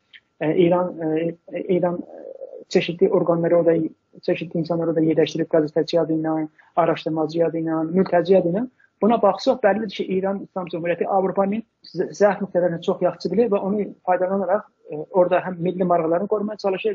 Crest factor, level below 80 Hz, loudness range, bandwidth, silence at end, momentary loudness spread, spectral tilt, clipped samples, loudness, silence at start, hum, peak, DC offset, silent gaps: 16 dB; -68 dBFS; 2 LU; 7.4 kHz; 0 s; 10 LU; -6 dB/octave; under 0.1%; -21 LUFS; 0.15 s; none; -4 dBFS; under 0.1%; none